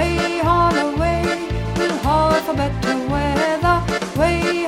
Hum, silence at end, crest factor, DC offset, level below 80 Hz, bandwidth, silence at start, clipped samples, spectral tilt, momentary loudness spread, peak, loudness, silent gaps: none; 0 s; 14 dB; under 0.1%; -30 dBFS; 16.5 kHz; 0 s; under 0.1%; -5.5 dB/octave; 5 LU; -4 dBFS; -19 LUFS; none